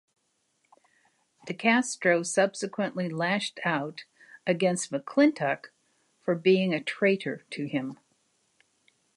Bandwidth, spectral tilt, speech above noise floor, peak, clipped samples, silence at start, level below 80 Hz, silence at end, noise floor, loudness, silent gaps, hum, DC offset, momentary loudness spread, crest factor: 11.5 kHz; -4.5 dB/octave; 47 dB; -8 dBFS; under 0.1%; 1.45 s; -80 dBFS; 1.2 s; -73 dBFS; -27 LUFS; none; none; under 0.1%; 12 LU; 20 dB